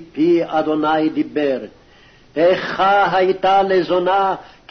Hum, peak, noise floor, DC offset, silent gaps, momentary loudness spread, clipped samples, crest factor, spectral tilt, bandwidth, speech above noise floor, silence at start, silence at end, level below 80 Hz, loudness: none; -6 dBFS; -48 dBFS; under 0.1%; none; 7 LU; under 0.1%; 12 dB; -6.5 dB/octave; 6.4 kHz; 31 dB; 0 s; 0.25 s; -54 dBFS; -17 LUFS